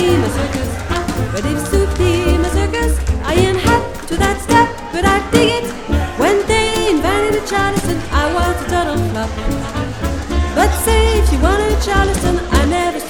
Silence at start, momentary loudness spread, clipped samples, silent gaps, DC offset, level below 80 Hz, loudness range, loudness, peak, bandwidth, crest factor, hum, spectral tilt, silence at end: 0 s; 7 LU; under 0.1%; none; under 0.1%; -20 dBFS; 2 LU; -16 LUFS; 0 dBFS; 19 kHz; 14 dB; none; -5 dB/octave; 0 s